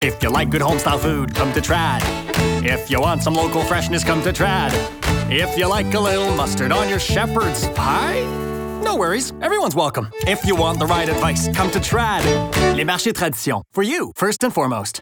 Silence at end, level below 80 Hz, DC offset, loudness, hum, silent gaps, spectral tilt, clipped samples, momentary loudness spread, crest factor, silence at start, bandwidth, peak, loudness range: 0 s; -34 dBFS; under 0.1%; -19 LUFS; none; none; -4.5 dB/octave; under 0.1%; 4 LU; 14 dB; 0 s; over 20 kHz; -4 dBFS; 1 LU